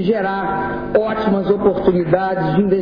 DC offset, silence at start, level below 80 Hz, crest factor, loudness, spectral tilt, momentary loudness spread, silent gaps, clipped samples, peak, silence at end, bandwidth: under 0.1%; 0 s; -42 dBFS; 12 dB; -17 LUFS; -10 dB/octave; 5 LU; none; under 0.1%; -4 dBFS; 0 s; 5.2 kHz